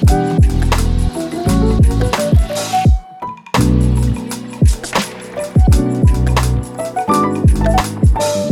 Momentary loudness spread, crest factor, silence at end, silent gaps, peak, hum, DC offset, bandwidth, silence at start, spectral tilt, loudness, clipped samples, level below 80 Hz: 8 LU; 12 dB; 0 s; none; -2 dBFS; none; under 0.1%; 16 kHz; 0 s; -6 dB/octave; -15 LUFS; under 0.1%; -18 dBFS